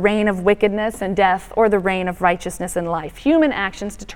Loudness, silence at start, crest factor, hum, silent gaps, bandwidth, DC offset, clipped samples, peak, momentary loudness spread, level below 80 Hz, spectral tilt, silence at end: -19 LUFS; 0 s; 18 dB; none; none; 17 kHz; under 0.1%; under 0.1%; 0 dBFS; 8 LU; -42 dBFS; -5.5 dB/octave; 0 s